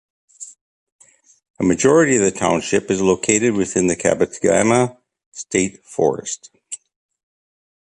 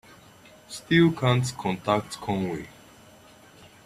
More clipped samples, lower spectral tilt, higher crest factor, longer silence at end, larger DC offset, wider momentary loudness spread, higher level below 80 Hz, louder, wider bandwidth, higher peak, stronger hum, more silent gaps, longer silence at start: neither; second, -4.5 dB/octave vs -6 dB/octave; about the same, 18 dB vs 20 dB; about the same, 1.2 s vs 1.15 s; neither; about the same, 20 LU vs 19 LU; first, -50 dBFS vs -58 dBFS; first, -17 LUFS vs -25 LUFS; second, 11.5 kHz vs 14 kHz; first, -2 dBFS vs -8 dBFS; neither; first, 0.61-0.99 s, 1.50-1.54 s, 5.26-5.32 s vs none; second, 0.4 s vs 0.7 s